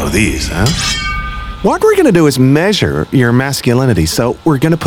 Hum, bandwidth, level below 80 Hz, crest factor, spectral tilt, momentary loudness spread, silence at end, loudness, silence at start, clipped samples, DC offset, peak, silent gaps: none; 18 kHz; -26 dBFS; 12 dB; -5.5 dB/octave; 7 LU; 0 s; -12 LUFS; 0 s; under 0.1%; under 0.1%; 0 dBFS; none